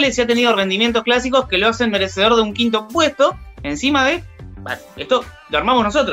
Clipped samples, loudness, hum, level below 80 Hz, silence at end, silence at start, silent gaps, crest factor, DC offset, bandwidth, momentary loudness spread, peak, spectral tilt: under 0.1%; -16 LUFS; none; -40 dBFS; 0 s; 0 s; none; 16 dB; under 0.1%; 16 kHz; 13 LU; -2 dBFS; -3.5 dB/octave